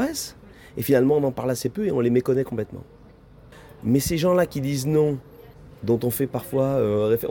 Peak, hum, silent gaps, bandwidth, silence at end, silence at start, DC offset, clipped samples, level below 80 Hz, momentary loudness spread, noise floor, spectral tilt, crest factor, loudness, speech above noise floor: -6 dBFS; none; none; 18 kHz; 0 s; 0 s; under 0.1%; under 0.1%; -50 dBFS; 12 LU; -48 dBFS; -6 dB/octave; 16 dB; -23 LUFS; 27 dB